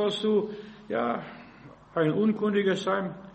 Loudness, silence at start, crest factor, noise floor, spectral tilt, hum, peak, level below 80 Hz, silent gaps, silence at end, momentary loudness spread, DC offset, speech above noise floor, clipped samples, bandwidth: -28 LUFS; 0 s; 14 dB; -50 dBFS; -6.5 dB/octave; none; -14 dBFS; -66 dBFS; none; 0 s; 14 LU; under 0.1%; 23 dB; under 0.1%; 8.4 kHz